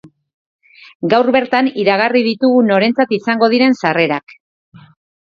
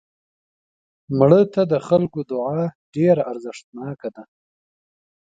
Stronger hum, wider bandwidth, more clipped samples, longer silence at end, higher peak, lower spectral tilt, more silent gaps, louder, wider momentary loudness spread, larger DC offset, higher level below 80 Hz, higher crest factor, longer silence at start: neither; about the same, 7.2 kHz vs 7.8 kHz; neither; about the same, 1.05 s vs 1 s; about the same, 0 dBFS vs 0 dBFS; second, -6.5 dB/octave vs -8.5 dB/octave; about the same, 0.34-0.59 s, 0.95-1.00 s vs 2.75-2.93 s, 3.64-3.73 s; first, -14 LUFS vs -19 LUFS; second, 4 LU vs 18 LU; neither; about the same, -60 dBFS vs -60 dBFS; second, 14 dB vs 20 dB; second, 0.05 s vs 1.1 s